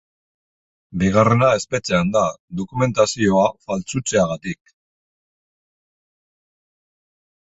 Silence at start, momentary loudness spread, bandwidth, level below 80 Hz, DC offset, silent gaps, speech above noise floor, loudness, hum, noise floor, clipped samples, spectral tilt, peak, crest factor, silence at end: 0.9 s; 13 LU; 8.2 kHz; -48 dBFS; under 0.1%; 2.40-2.48 s; over 71 dB; -19 LUFS; none; under -90 dBFS; under 0.1%; -5.5 dB/octave; 0 dBFS; 22 dB; 3 s